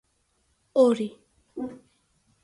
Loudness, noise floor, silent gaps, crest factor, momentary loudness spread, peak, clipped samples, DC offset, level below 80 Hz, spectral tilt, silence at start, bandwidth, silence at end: -25 LUFS; -70 dBFS; none; 20 dB; 17 LU; -8 dBFS; under 0.1%; under 0.1%; -70 dBFS; -6 dB/octave; 0.75 s; 11.5 kHz; 0.7 s